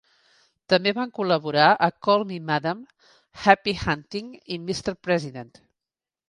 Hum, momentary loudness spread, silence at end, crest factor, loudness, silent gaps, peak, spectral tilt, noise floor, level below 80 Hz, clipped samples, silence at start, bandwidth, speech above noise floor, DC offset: none; 16 LU; 0.85 s; 22 dB; -23 LUFS; none; -2 dBFS; -5 dB/octave; under -90 dBFS; -54 dBFS; under 0.1%; 0.7 s; 11.5 kHz; over 67 dB; under 0.1%